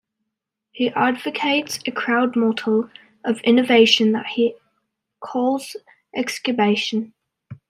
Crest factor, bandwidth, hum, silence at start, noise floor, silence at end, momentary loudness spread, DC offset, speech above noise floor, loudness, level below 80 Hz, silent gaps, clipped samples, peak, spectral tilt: 20 dB; 14 kHz; none; 0.75 s; -81 dBFS; 0.15 s; 15 LU; under 0.1%; 62 dB; -20 LUFS; -70 dBFS; none; under 0.1%; -2 dBFS; -4 dB/octave